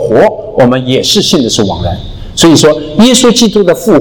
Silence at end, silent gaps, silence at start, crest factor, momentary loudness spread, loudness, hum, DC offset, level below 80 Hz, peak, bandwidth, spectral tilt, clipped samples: 0 s; none; 0 s; 8 dB; 10 LU; -7 LUFS; none; under 0.1%; -30 dBFS; 0 dBFS; 19.5 kHz; -4 dB/octave; 5%